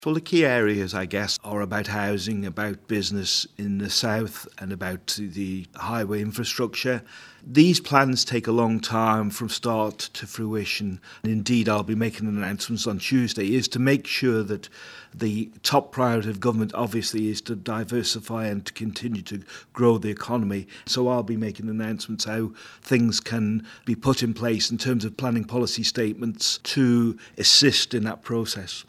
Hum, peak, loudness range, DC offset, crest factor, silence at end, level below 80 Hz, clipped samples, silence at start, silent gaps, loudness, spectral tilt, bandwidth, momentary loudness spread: none; 0 dBFS; 5 LU; under 0.1%; 24 dB; 0.05 s; -62 dBFS; under 0.1%; 0 s; none; -24 LUFS; -4.5 dB/octave; 15.5 kHz; 10 LU